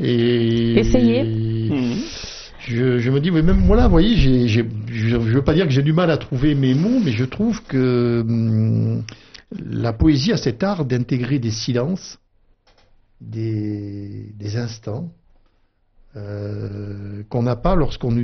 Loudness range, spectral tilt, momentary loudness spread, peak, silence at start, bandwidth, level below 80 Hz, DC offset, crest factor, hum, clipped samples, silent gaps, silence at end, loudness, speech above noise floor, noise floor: 12 LU; -7 dB/octave; 15 LU; -2 dBFS; 0 s; 6.4 kHz; -28 dBFS; under 0.1%; 16 dB; none; under 0.1%; none; 0 s; -19 LUFS; 42 dB; -60 dBFS